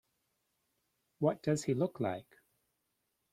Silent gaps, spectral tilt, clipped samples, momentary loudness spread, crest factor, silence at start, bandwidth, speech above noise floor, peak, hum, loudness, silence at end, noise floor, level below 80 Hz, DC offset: none; -6.5 dB/octave; under 0.1%; 6 LU; 22 dB; 1.2 s; 15 kHz; 49 dB; -16 dBFS; none; -35 LUFS; 1.1 s; -83 dBFS; -74 dBFS; under 0.1%